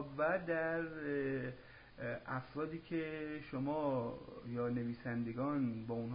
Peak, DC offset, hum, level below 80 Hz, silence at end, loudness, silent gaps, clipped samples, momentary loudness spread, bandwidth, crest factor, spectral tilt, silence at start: -24 dBFS; under 0.1%; none; -68 dBFS; 0 s; -40 LUFS; none; under 0.1%; 9 LU; 5 kHz; 16 dB; -6.5 dB/octave; 0 s